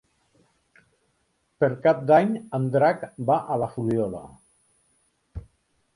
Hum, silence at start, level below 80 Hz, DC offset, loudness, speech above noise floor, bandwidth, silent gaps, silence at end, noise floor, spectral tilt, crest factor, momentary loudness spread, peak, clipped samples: none; 1.6 s; -54 dBFS; under 0.1%; -23 LUFS; 48 dB; 10.5 kHz; none; 0.55 s; -71 dBFS; -8.5 dB/octave; 20 dB; 23 LU; -6 dBFS; under 0.1%